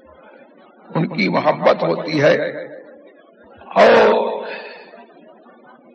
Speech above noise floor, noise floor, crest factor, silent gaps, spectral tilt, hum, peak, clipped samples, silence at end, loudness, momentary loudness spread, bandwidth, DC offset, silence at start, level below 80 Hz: 32 dB; -46 dBFS; 18 dB; none; -6.5 dB/octave; none; 0 dBFS; under 0.1%; 0.9 s; -16 LUFS; 20 LU; 8.2 kHz; under 0.1%; 0.9 s; -62 dBFS